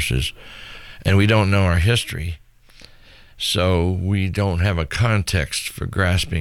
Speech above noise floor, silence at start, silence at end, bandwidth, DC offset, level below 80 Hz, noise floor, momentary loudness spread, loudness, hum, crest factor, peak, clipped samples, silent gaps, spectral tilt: 27 dB; 0 s; 0 s; 15 kHz; under 0.1%; -34 dBFS; -46 dBFS; 14 LU; -20 LUFS; none; 14 dB; -6 dBFS; under 0.1%; none; -5 dB/octave